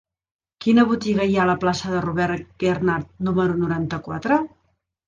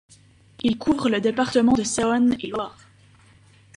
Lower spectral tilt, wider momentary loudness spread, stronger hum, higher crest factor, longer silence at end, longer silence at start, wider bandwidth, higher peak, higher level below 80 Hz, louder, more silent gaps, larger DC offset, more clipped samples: first, -6.5 dB/octave vs -4.5 dB/octave; about the same, 8 LU vs 10 LU; neither; about the same, 16 dB vs 16 dB; second, 0.6 s vs 1.05 s; about the same, 0.6 s vs 0.65 s; second, 7.6 kHz vs 11.5 kHz; about the same, -4 dBFS vs -6 dBFS; about the same, -50 dBFS vs -52 dBFS; about the same, -21 LUFS vs -22 LUFS; neither; neither; neither